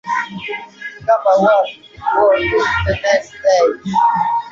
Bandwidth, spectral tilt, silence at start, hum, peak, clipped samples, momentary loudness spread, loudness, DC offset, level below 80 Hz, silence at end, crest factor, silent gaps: 7.6 kHz; -5 dB/octave; 0.05 s; none; -2 dBFS; under 0.1%; 12 LU; -15 LUFS; under 0.1%; -38 dBFS; 0 s; 14 dB; none